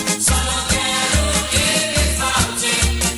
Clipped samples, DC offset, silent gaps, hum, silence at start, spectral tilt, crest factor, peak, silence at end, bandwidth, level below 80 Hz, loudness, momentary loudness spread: under 0.1%; under 0.1%; none; none; 0 s; -2.5 dB/octave; 16 dB; -2 dBFS; 0 s; over 20 kHz; -24 dBFS; -16 LUFS; 2 LU